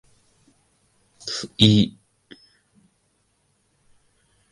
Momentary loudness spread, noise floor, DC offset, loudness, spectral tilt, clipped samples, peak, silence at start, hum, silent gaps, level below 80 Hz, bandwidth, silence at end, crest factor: 15 LU; -68 dBFS; under 0.1%; -20 LUFS; -5.5 dB/octave; under 0.1%; -2 dBFS; 1.25 s; none; none; -52 dBFS; 11.5 kHz; 2.6 s; 26 dB